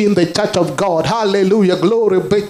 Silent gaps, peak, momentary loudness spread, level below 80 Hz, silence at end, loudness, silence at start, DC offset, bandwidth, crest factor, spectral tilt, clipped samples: none; 0 dBFS; 3 LU; -48 dBFS; 0 s; -14 LUFS; 0 s; under 0.1%; 15 kHz; 12 dB; -6 dB/octave; under 0.1%